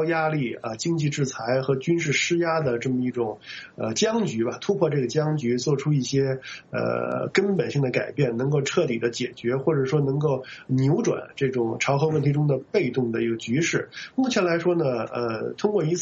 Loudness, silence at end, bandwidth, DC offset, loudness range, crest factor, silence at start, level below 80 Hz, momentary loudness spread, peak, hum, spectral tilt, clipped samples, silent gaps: -24 LUFS; 0 s; 8 kHz; under 0.1%; 1 LU; 16 dB; 0 s; -62 dBFS; 6 LU; -6 dBFS; none; -5.5 dB/octave; under 0.1%; none